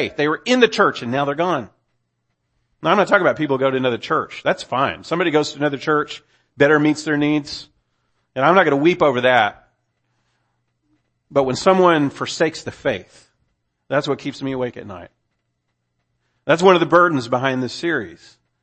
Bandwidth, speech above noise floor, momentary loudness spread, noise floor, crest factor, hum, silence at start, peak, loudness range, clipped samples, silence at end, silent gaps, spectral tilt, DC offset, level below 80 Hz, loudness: 8.8 kHz; 55 dB; 12 LU; -73 dBFS; 20 dB; none; 0 s; 0 dBFS; 6 LU; under 0.1%; 0.45 s; none; -5.5 dB/octave; under 0.1%; -58 dBFS; -18 LUFS